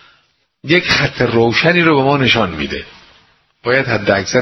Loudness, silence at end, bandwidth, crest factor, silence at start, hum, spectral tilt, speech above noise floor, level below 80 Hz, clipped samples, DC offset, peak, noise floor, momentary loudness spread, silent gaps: -13 LUFS; 0 s; 6.2 kHz; 16 dB; 0.65 s; none; -5 dB/octave; 45 dB; -42 dBFS; under 0.1%; under 0.1%; 0 dBFS; -58 dBFS; 11 LU; none